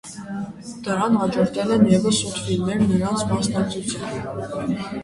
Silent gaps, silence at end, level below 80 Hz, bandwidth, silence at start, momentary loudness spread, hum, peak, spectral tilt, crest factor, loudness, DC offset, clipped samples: none; 0 s; -48 dBFS; 11.5 kHz; 0.05 s; 14 LU; none; -4 dBFS; -5.5 dB/octave; 18 dB; -22 LUFS; under 0.1%; under 0.1%